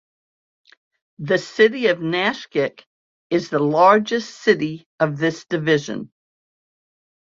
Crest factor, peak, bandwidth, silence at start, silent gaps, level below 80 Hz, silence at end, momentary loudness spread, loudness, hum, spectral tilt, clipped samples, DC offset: 20 dB; -2 dBFS; 7.6 kHz; 1.2 s; 2.86-3.30 s, 4.86-4.98 s; -66 dBFS; 1.3 s; 12 LU; -19 LUFS; none; -5.5 dB/octave; under 0.1%; under 0.1%